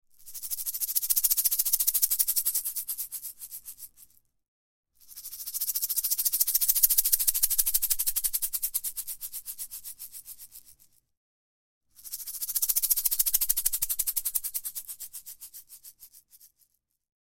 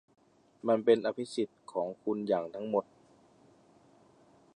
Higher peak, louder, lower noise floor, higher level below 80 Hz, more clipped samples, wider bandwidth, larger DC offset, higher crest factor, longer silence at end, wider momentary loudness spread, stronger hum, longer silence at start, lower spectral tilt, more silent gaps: first, -4 dBFS vs -12 dBFS; first, -25 LUFS vs -32 LUFS; first, -70 dBFS vs -63 dBFS; first, -56 dBFS vs -82 dBFS; neither; first, 17 kHz vs 10.5 kHz; neither; about the same, 26 dB vs 22 dB; second, 0.8 s vs 1.75 s; first, 20 LU vs 10 LU; neither; second, 0.2 s vs 0.65 s; second, 3.5 dB/octave vs -6 dB/octave; first, 4.48-4.83 s, 11.17-11.81 s vs none